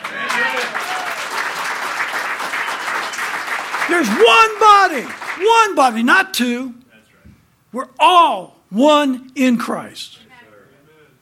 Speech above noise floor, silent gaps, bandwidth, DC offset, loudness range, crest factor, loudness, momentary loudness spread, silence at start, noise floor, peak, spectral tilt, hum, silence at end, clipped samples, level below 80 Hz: 36 dB; none; 17 kHz; under 0.1%; 7 LU; 16 dB; -15 LUFS; 16 LU; 0 s; -50 dBFS; 0 dBFS; -2.5 dB/octave; none; 1.15 s; under 0.1%; -62 dBFS